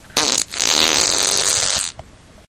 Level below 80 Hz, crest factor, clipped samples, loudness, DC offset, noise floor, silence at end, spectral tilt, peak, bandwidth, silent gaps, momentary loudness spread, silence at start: -46 dBFS; 20 dB; under 0.1%; -15 LUFS; under 0.1%; -41 dBFS; 0.45 s; 0.5 dB/octave; 0 dBFS; 17 kHz; none; 6 LU; 0.15 s